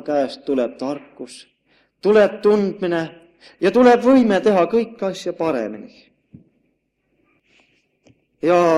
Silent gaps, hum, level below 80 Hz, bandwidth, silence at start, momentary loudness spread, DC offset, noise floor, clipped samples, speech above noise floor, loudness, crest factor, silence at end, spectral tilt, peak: none; none; -62 dBFS; 11 kHz; 0.05 s; 17 LU; under 0.1%; -68 dBFS; under 0.1%; 51 dB; -18 LUFS; 18 dB; 0 s; -6.5 dB/octave; 0 dBFS